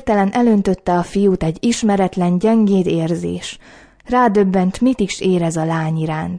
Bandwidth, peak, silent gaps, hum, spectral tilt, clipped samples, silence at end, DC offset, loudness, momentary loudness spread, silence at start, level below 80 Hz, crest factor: 10.5 kHz; -2 dBFS; none; none; -6.5 dB/octave; under 0.1%; 0 s; under 0.1%; -16 LUFS; 7 LU; 0.05 s; -42 dBFS; 14 dB